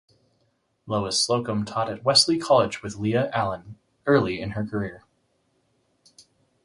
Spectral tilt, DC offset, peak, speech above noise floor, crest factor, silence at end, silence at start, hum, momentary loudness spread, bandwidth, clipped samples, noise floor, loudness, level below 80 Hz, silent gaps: -4 dB/octave; under 0.1%; -4 dBFS; 46 dB; 22 dB; 1.65 s; 0.85 s; none; 12 LU; 11.5 kHz; under 0.1%; -70 dBFS; -23 LUFS; -56 dBFS; none